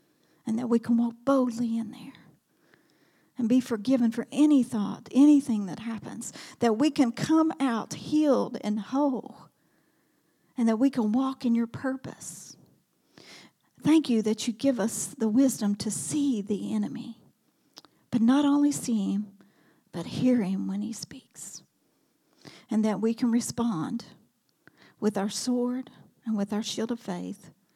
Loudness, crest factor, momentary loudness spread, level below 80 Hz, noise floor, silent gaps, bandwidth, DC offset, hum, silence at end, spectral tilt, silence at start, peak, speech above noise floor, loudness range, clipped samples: -27 LUFS; 16 dB; 17 LU; -74 dBFS; -70 dBFS; none; 14.5 kHz; under 0.1%; none; 0.25 s; -5.5 dB/octave; 0.45 s; -12 dBFS; 44 dB; 6 LU; under 0.1%